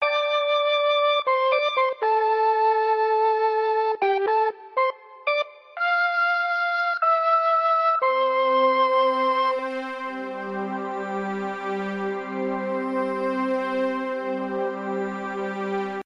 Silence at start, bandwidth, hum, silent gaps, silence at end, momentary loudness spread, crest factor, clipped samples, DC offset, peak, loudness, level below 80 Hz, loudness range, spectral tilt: 0 s; 10 kHz; none; none; 0.05 s; 9 LU; 14 dB; under 0.1%; under 0.1%; -8 dBFS; -23 LUFS; -78 dBFS; 7 LU; -5.5 dB/octave